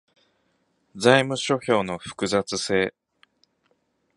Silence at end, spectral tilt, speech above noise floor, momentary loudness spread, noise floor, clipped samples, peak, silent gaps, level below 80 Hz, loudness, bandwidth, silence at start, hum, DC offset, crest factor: 1.25 s; -4 dB/octave; 47 dB; 10 LU; -69 dBFS; under 0.1%; -2 dBFS; none; -60 dBFS; -23 LUFS; 11.5 kHz; 0.95 s; none; under 0.1%; 24 dB